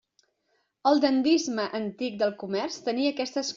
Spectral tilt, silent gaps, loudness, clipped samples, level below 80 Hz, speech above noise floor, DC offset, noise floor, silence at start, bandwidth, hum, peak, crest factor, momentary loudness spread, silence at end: -3 dB/octave; none; -27 LUFS; under 0.1%; -72 dBFS; 47 dB; under 0.1%; -73 dBFS; 0.85 s; 7.6 kHz; none; -10 dBFS; 18 dB; 9 LU; 0 s